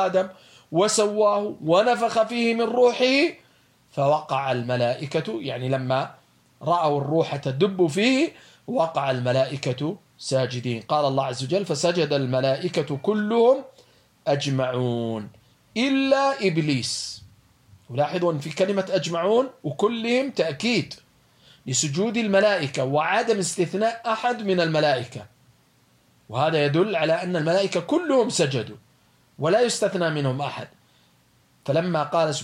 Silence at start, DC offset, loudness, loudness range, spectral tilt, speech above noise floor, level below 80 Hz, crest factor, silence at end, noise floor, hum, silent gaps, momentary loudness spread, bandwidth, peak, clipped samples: 0 s; under 0.1%; -23 LUFS; 3 LU; -5 dB/octave; 38 dB; -68 dBFS; 18 dB; 0 s; -61 dBFS; none; none; 10 LU; 13.5 kHz; -6 dBFS; under 0.1%